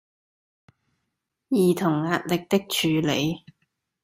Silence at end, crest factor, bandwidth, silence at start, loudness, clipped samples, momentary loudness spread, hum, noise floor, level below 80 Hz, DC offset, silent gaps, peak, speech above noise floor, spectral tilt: 0.65 s; 18 dB; 16 kHz; 1.5 s; -24 LUFS; under 0.1%; 5 LU; none; -80 dBFS; -62 dBFS; under 0.1%; none; -8 dBFS; 57 dB; -5 dB/octave